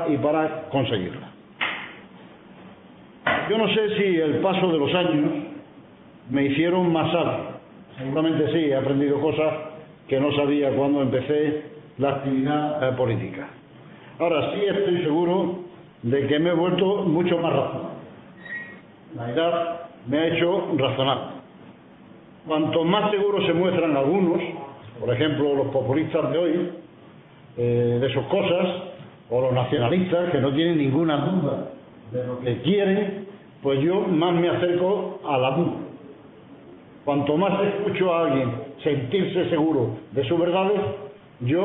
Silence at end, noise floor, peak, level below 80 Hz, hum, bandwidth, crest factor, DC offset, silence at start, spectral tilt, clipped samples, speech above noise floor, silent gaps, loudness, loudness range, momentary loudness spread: 0 s; -48 dBFS; -4 dBFS; -60 dBFS; none; 4 kHz; 20 dB; under 0.1%; 0 s; -11 dB/octave; under 0.1%; 26 dB; none; -23 LUFS; 3 LU; 14 LU